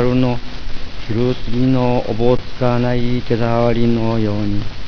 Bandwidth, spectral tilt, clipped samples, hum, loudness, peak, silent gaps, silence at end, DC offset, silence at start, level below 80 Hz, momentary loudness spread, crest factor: 5.4 kHz; -8.5 dB/octave; under 0.1%; none; -18 LUFS; 0 dBFS; none; 0 s; 8%; 0 s; -28 dBFS; 10 LU; 14 dB